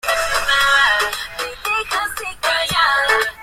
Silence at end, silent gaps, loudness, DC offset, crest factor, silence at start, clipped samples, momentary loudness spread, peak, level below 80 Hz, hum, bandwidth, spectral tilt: 0 s; none; -16 LUFS; under 0.1%; 14 dB; 0.05 s; under 0.1%; 11 LU; -4 dBFS; -42 dBFS; none; 16 kHz; 0 dB/octave